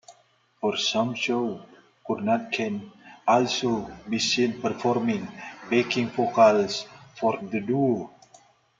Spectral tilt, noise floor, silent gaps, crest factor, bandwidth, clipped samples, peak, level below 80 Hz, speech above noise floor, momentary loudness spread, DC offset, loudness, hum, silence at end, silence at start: -4.5 dB/octave; -63 dBFS; none; 20 dB; 9 kHz; under 0.1%; -6 dBFS; -66 dBFS; 38 dB; 11 LU; under 0.1%; -25 LUFS; none; 0.7 s; 0.1 s